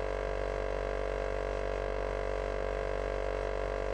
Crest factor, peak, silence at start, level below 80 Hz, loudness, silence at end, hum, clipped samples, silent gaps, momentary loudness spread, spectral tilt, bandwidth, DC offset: 14 dB; -20 dBFS; 0 s; -40 dBFS; -35 LUFS; 0 s; none; under 0.1%; none; 0 LU; -6 dB/octave; 9.4 kHz; under 0.1%